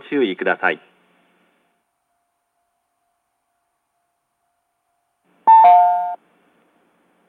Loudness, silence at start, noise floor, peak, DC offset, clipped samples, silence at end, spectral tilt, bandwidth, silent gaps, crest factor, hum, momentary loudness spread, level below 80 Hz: -14 LUFS; 0.1 s; -72 dBFS; -2 dBFS; under 0.1%; under 0.1%; 1.15 s; -6.5 dB/octave; 4.1 kHz; none; 18 dB; none; 19 LU; -88 dBFS